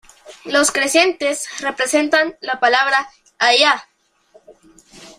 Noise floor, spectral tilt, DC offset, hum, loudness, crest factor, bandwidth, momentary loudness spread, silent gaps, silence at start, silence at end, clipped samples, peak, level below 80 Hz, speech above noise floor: -53 dBFS; 0 dB/octave; under 0.1%; none; -16 LUFS; 18 dB; 16 kHz; 9 LU; none; 0.25 s; 0.1 s; under 0.1%; 0 dBFS; -60 dBFS; 37 dB